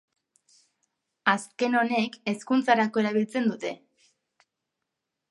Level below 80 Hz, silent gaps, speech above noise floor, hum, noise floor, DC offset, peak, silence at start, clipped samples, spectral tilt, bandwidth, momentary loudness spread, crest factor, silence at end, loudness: -80 dBFS; none; 59 dB; none; -84 dBFS; under 0.1%; -4 dBFS; 1.25 s; under 0.1%; -5 dB/octave; 11.5 kHz; 10 LU; 24 dB; 1.55 s; -26 LUFS